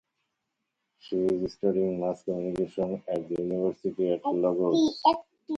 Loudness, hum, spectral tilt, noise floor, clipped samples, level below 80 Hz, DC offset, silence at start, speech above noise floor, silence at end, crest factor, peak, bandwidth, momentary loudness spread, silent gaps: -28 LUFS; none; -7 dB/octave; -82 dBFS; under 0.1%; -64 dBFS; under 0.1%; 1.05 s; 55 dB; 0 s; 20 dB; -8 dBFS; 8 kHz; 8 LU; none